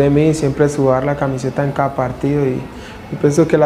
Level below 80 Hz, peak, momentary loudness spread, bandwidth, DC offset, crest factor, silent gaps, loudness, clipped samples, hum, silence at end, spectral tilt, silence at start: -40 dBFS; -2 dBFS; 11 LU; 12.5 kHz; under 0.1%; 14 dB; none; -16 LUFS; under 0.1%; none; 0 s; -7 dB/octave; 0 s